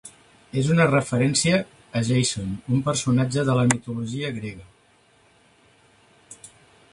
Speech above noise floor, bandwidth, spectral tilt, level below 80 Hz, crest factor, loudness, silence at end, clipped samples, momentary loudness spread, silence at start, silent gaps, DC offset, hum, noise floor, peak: 37 dB; 11.5 kHz; -5 dB/octave; -54 dBFS; 22 dB; -23 LUFS; 0.45 s; under 0.1%; 13 LU; 0.05 s; none; under 0.1%; none; -59 dBFS; -2 dBFS